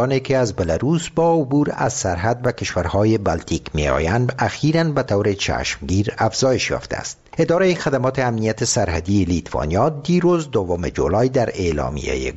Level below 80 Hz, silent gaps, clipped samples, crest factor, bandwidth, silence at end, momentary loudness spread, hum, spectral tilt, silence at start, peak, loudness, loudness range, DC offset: -36 dBFS; none; under 0.1%; 16 dB; 8.2 kHz; 0 s; 5 LU; none; -5.5 dB/octave; 0 s; -4 dBFS; -19 LUFS; 1 LU; 0.1%